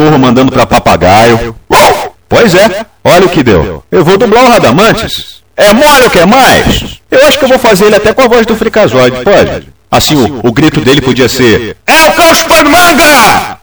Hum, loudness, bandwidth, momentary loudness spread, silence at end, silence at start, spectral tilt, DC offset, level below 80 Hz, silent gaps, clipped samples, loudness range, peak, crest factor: none; -5 LUFS; over 20 kHz; 8 LU; 0.1 s; 0 s; -4 dB/octave; 1%; -28 dBFS; none; 8%; 2 LU; 0 dBFS; 4 dB